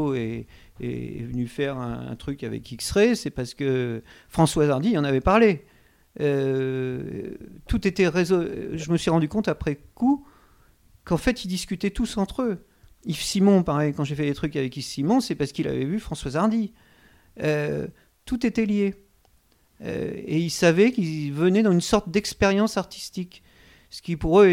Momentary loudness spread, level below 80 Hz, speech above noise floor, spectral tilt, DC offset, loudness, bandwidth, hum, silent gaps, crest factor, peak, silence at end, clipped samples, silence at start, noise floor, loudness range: 13 LU; -44 dBFS; 38 dB; -6 dB/octave; under 0.1%; -24 LUFS; 16 kHz; none; none; 20 dB; -4 dBFS; 0 s; under 0.1%; 0 s; -61 dBFS; 5 LU